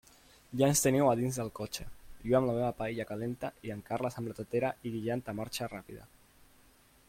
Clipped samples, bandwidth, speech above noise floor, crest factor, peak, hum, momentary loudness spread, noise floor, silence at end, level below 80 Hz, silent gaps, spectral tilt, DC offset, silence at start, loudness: under 0.1%; 16.5 kHz; 30 dB; 20 dB; -12 dBFS; none; 16 LU; -63 dBFS; 1 s; -58 dBFS; none; -5 dB/octave; under 0.1%; 0.5 s; -33 LUFS